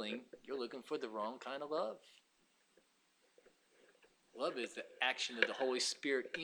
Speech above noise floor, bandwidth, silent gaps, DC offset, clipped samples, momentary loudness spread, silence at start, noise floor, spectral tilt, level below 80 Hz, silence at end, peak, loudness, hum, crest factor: 35 dB; over 20 kHz; none; under 0.1%; under 0.1%; 10 LU; 0 s; -76 dBFS; -1.5 dB/octave; under -90 dBFS; 0 s; -14 dBFS; -40 LUFS; none; 30 dB